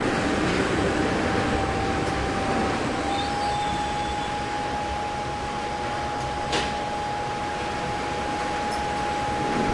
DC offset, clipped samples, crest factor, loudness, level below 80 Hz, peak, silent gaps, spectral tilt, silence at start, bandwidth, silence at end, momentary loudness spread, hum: under 0.1%; under 0.1%; 16 dB; -26 LUFS; -40 dBFS; -10 dBFS; none; -4.5 dB/octave; 0 s; 11.5 kHz; 0 s; 5 LU; none